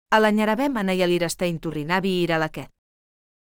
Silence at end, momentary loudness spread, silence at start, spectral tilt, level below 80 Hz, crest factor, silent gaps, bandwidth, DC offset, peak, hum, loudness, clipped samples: 0.8 s; 9 LU; 0.1 s; -5 dB/octave; -52 dBFS; 18 dB; none; 19.5 kHz; under 0.1%; -6 dBFS; none; -22 LUFS; under 0.1%